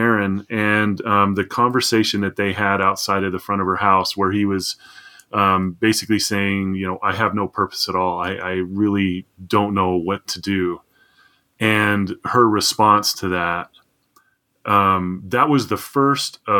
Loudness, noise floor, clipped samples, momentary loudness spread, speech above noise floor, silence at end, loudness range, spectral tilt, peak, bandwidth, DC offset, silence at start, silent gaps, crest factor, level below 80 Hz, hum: -19 LUFS; -60 dBFS; under 0.1%; 8 LU; 41 dB; 0 s; 3 LU; -4.5 dB/octave; 0 dBFS; 18 kHz; under 0.1%; 0 s; none; 18 dB; -62 dBFS; none